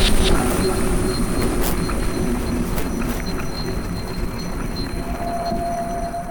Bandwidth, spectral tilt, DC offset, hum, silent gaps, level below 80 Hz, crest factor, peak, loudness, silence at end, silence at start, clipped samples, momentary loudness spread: over 20 kHz; -5 dB/octave; under 0.1%; none; none; -24 dBFS; 14 dB; -6 dBFS; -23 LUFS; 0 s; 0 s; under 0.1%; 8 LU